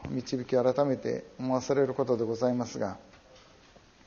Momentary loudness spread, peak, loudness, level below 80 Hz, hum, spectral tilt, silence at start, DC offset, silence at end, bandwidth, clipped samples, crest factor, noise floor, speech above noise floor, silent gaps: 8 LU; -12 dBFS; -30 LUFS; -62 dBFS; none; -6.5 dB/octave; 0 s; under 0.1%; 0.9 s; 7.2 kHz; under 0.1%; 18 dB; -57 dBFS; 28 dB; none